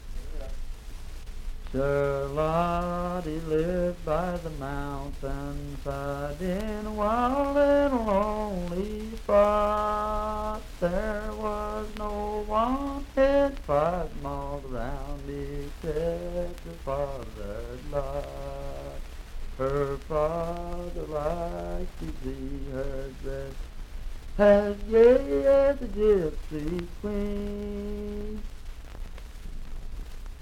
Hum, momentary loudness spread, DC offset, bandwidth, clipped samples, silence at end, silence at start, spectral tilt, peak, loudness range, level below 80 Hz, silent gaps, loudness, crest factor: none; 21 LU; under 0.1%; 16 kHz; under 0.1%; 0 s; 0 s; -7 dB/octave; -8 dBFS; 11 LU; -36 dBFS; none; -28 LUFS; 20 dB